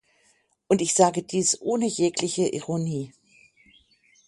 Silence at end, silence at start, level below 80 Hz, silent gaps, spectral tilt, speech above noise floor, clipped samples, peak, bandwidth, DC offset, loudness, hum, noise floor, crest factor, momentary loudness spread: 1.2 s; 0.7 s; -66 dBFS; none; -4 dB/octave; 42 dB; under 0.1%; -4 dBFS; 11.5 kHz; under 0.1%; -24 LUFS; none; -65 dBFS; 22 dB; 9 LU